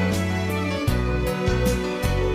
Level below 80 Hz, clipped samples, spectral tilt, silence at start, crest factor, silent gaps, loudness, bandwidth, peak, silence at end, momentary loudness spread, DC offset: -30 dBFS; under 0.1%; -6 dB/octave; 0 s; 12 dB; none; -24 LUFS; 16 kHz; -10 dBFS; 0 s; 2 LU; under 0.1%